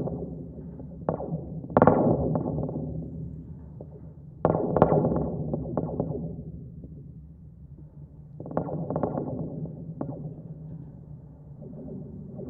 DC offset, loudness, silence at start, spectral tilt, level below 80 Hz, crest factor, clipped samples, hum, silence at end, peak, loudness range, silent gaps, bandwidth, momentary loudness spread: under 0.1%; -29 LUFS; 0 s; -11 dB/octave; -48 dBFS; 28 dB; under 0.1%; none; 0 s; -2 dBFS; 9 LU; none; 3.6 kHz; 24 LU